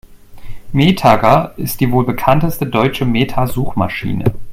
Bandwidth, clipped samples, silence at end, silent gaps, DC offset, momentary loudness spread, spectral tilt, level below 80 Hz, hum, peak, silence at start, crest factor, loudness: 16.5 kHz; under 0.1%; 0 s; none; under 0.1%; 8 LU; -6.5 dB/octave; -32 dBFS; none; 0 dBFS; 0.1 s; 14 dB; -15 LUFS